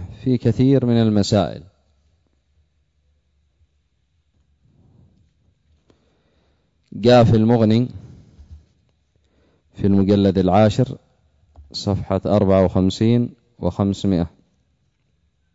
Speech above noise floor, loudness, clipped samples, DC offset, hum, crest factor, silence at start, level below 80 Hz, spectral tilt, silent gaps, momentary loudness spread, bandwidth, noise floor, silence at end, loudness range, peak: 50 dB; -18 LUFS; under 0.1%; under 0.1%; none; 16 dB; 0 s; -46 dBFS; -7.5 dB/octave; none; 13 LU; 7.8 kHz; -66 dBFS; 1.25 s; 4 LU; -4 dBFS